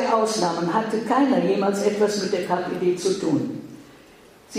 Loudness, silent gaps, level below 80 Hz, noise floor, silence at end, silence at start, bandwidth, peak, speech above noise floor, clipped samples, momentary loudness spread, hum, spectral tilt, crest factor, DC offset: -22 LUFS; none; -64 dBFS; -49 dBFS; 0 s; 0 s; 15.5 kHz; -6 dBFS; 28 dB; under 0.1%; 6 LU; none; -5 dB/octave; 16 dB; under 0.1%